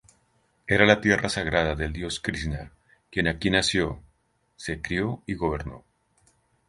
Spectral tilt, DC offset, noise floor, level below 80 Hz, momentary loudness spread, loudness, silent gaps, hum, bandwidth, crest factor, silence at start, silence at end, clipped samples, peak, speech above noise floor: -4.5 dB/octave; under 0.1%; -68 dBFS; -42 dBFS; 15 LU; -25 LUFS; none; none; 11.5 kHz; 26 dB; 0.65 s; 0.9 s; under 0.1%; -2 dBFS; 43 dB